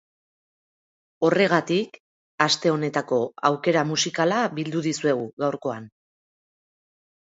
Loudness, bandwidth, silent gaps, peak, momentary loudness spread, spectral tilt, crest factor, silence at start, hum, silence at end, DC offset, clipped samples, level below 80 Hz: -23 LUFS; 8 kHz; 2.00-2.38 s, 5.33-5.37 s; -2 dBFS; 7 LU; -4.5 dB/octave; 24 dB; 1.2 s; none; 1.35 s; under 0.1%; under 0.1%; -72 dBFS